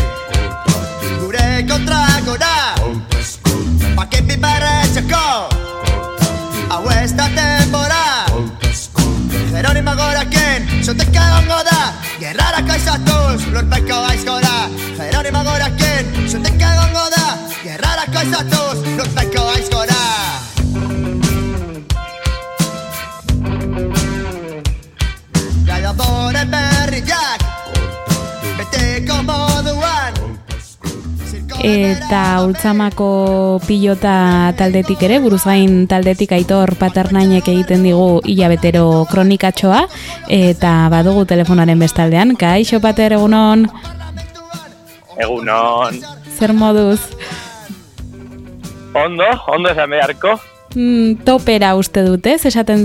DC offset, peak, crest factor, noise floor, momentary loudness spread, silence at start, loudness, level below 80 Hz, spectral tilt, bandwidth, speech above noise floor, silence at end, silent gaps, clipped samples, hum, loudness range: under 0.1%; 0 dBFS; 14 dB; -39 dBFS; 11 LU; 0 s; -14 LUFS; -24 dBFS; -5 dB/octave; 17.5 kHz; 26 dB; 0 s; none; under 0.1%; none; 6 LU